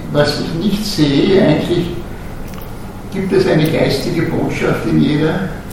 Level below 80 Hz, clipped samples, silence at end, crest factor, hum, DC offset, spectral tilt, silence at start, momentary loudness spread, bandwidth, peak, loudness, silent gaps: -32 dBFS; under 0.1%; 0 s; 14 dB; none; under 0.1%; -6.5 dB/octave; 0 s; 17 LU; 17 kHz; 0 dBFS; -15 LUFS; none